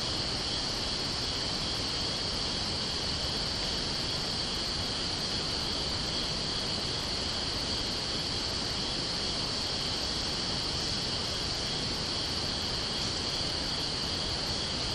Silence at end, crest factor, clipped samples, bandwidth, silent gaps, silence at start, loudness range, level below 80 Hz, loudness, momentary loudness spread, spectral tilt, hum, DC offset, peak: 0 s; 14 dB; under 0.1%; 13 kHz; none; 0 s; 0 LU; -46 dBFS; -30 LUFS; 1 LU; -2.5 dB/octave; none; under 0.1%; -20 dBFS